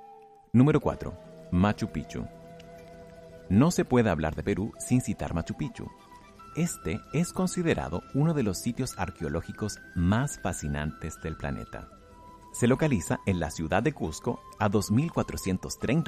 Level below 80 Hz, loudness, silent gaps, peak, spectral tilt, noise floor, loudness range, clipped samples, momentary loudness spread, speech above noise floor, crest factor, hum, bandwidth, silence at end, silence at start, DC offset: -46 dBFS; -29 LUFS; none; -8 dBFS; -6 dB/octave; -52 dBFS; 4 LU; under 0.1%; 18 LU; 24 dB; 20 dB; none; 15 kHz; 0 s; 0 s; under 0.1%